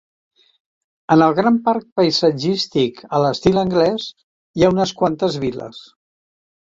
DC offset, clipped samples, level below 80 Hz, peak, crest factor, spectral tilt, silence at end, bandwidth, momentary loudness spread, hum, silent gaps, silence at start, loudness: under 0.1%; under 0.1%; -50 dBFS; -2 dBFS; 18 dB; -6 dB/octave; 0.85 s; 7.8 kHz; 13 LU; none; 1.92-1.96 s, 4.23-4.54 s; 1.1 s; -17 LUFS